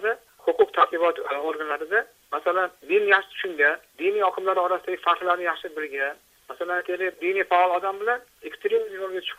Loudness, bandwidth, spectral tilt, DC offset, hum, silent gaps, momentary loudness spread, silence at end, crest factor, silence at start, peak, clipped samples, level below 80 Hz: -24 LUFS; 15.5 kHz; -3 dB/octave; under 0.1%; none; none; 10 LU; 0.05 s; 20 dB; 0 s; -6 dBFS; under 0.1%; -72 dBFS